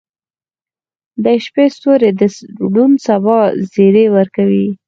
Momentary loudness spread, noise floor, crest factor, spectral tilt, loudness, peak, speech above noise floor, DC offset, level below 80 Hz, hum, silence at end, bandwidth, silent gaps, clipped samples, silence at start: 6 LU; under -90 dBFS; 12 dB; -7.5 dB/octave; -12 LUFS; 0 dBFS; over 79 dB; under 0.1%; -60 dBFS; none; 0.1 s; 7.4 kHz; none; under 0.1%; 1.2 s